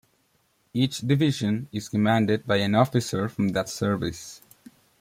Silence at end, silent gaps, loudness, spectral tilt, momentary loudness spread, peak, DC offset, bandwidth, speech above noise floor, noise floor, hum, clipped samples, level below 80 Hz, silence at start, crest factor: 0.65 s; none; -25 LUFS; -6 dB/octave; 9 LU; -6 dBFS; under 0.1%; 16 kHz; 43 dB; -67 dBFS; none; under 0.1%; -58 dBFS; 0.75 s; 20 dB